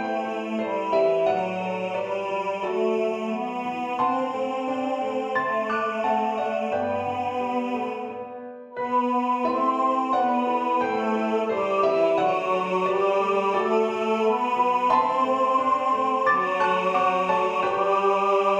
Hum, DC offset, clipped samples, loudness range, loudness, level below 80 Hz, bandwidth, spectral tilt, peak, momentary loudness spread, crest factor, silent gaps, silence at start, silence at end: none; under 0.1%; under 0.1%; 4 LU; -24 LUFS; -68 dBFS; 9.8 kHz; -5.5 dB/octave; -8 dBFS; 7 LU; 16 dB; none; 0 s; 0 s